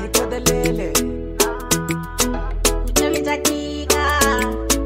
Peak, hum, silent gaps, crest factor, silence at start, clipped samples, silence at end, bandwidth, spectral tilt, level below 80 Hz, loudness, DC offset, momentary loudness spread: -2 dBFS; none; none; 18 dB; 0 s; under 0.1%; 0 s; 16.5 kHz; -3 dB/octave; -28 dBFS; -19 LUFS; under 0.1%; 4 LU